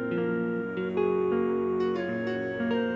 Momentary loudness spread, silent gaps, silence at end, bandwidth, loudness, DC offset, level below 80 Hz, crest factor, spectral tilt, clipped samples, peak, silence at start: 4 LU; none; 0 s; 7 kHz; -29 LUFS; under 0.1%; -60 dBFS; 12 dB; -8.5 dB/octave; under 0.1%; -16 dBFS; 0 s